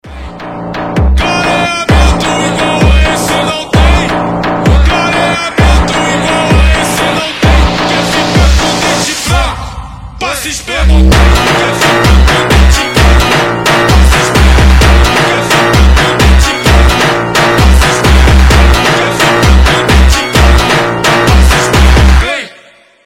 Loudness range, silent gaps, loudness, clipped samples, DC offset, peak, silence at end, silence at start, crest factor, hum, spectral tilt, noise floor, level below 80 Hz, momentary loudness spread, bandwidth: 3 LU; none; -8 LUFS; 0.2%; under 0.1%; 0 dBFS; 0.55 s; 0.05 s; 6 dB; none; -4.5 dB/octave; -40 dBFS; -10 dBFS; 6 LU; 16 kHz